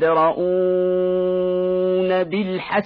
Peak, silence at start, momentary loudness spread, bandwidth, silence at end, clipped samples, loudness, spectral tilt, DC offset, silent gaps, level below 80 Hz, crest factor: -6 dBFS; 0 s; 3 LU; 5 kHz; 0 s; under 0.1%; -20 LUFS; -10 dB/octave; under 0.1%; none; -56 dBFS; 12 dB